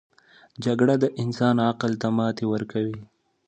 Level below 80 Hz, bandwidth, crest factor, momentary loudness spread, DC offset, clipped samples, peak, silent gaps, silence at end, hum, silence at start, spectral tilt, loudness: -64 dBFS; 8.6 kHz; 18 dB; 9 LU; under 0.1%; under 0.1%; -8 dBFS; none; 0.45 s; none; 0.6 s; -7.5 dB/octave; -24 LUFS